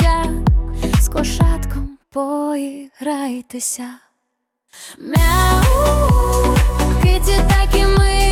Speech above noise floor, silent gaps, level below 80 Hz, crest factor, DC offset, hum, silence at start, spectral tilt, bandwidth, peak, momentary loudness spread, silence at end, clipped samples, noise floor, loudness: 60 dB; none; -18 dBFS; 12 dB; under 0.1%; none; 0 s; -5 dB/octave; 17.5 kHz; -2 dBFS; 13 LU; 0 s; under 0.1%; -74 dBFS; -17 LUFS